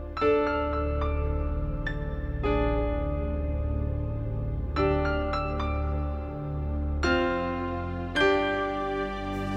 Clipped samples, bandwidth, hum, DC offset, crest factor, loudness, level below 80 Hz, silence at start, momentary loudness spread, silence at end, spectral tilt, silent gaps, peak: under 0.1%; 8 kHz; none; under 0.1%; 18 dB; -29 LUFS; -32 dBFS; 0 s; 7 LU; 0 s; -7.5 dB/octave; none; -10 dBFS